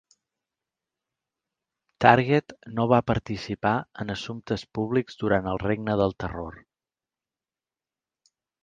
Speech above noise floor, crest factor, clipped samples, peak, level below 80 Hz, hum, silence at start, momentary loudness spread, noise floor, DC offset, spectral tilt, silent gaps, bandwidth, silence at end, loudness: over 65 dB; 26 dB; under 0.1%; -2 dBFS; -50 dBFS; none; 2 s; 14 LU; under -90 dBFS; under 0.1%; -7 dB/octave; none; 9.2 kHz; 2.05 s; -25 LUFS